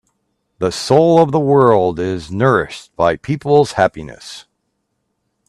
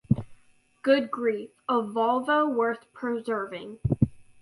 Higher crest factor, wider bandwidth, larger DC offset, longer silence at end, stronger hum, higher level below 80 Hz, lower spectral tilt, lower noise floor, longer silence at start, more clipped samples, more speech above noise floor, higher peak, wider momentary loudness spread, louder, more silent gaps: second, 16 dB vs 22 dB; about the same, 12.5 kHz vs 11.5 kHz; neither; first, 1.05 s vs 0.2 s; neither; about the same, -48 dBFS vs -50 dBFS; second, -6.5 dB/octave vs -8 dB/octave; first, -70 dBFS vs -60 dBFS; first, 0.6 s vs 0.1 s; neither; first, 56 dB vs 34 dB; first, 0 dBFS vs -6 dBFS; first, 20 LU vs 9 LU; first, -14 LUFS vs -27 LUFS; neither